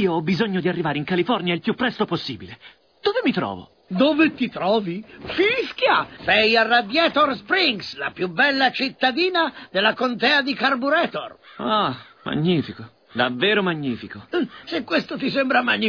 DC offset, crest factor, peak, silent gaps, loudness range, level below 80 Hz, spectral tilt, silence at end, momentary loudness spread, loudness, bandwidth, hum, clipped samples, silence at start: under 0.1%; 18 dB; -4 dBFS; none; 5 LU; -58 dBFS; -6.5 dB/octave; 0 s; 12 LU; -21 LUFS; 5.4 kHz; none; under 0.1%; 0 s